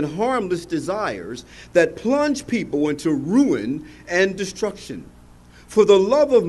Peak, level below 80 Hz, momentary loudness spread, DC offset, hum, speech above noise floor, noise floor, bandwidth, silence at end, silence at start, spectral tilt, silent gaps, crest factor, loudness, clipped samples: -2 dBFS; -50 dBFS; 16 LU; under 0.1%; 60 Hz at -50 dBFS; 27 dB; -46 dBFS; 12 kHz; 0 s; 0 s; -5.5 dB/octave; none; 18 dB; -20 LUFS; under 0.1%